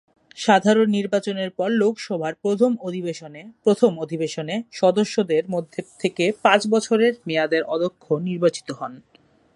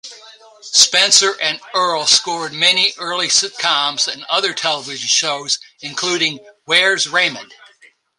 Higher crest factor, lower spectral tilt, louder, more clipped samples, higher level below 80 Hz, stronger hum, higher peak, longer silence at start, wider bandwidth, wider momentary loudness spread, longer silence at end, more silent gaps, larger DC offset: about the same, 20 dB vs 18 dB; first, -5 dB/octave vs 0.5 dB/octave; second, -21 LUFS vs -14 LUFS; neither; second, -72 dBFS vs -66 dBFS; neither; about the same, 0 dBFS vs 0 dBFS; first, 0.35 s vs 0.05 s; second, 11.5 kHz vs 16 kHz; about the same, 11 LU vs 10 LU; about the same, 0.6 s vs 0.65 s; neither; neither